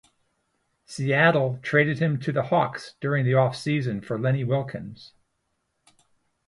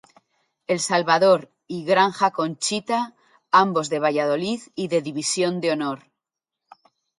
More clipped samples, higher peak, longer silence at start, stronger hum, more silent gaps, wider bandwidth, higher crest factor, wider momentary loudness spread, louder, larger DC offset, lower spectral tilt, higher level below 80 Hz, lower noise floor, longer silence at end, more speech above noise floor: neither; about the same, -6 dBFS vs -4 dBFS; first, 0.9 s vs 0.7 s; neither; neither; about the same, 11.5 kHz vs 11.5 kHz; about the same, 20 dB vs 20 dB; about the same, 12 LU vs 11 LU; about the same, -24 LUFS vs -22 LUFS; neither; first, -7 dB/octave vs -3.5 dB/octave; first, -64 dBFS vs -72 dBFS; second, -75 dBFS vs -85 dBFS; first, 1.4 s vs 1.2 s; second, 52 dB vs 64 dB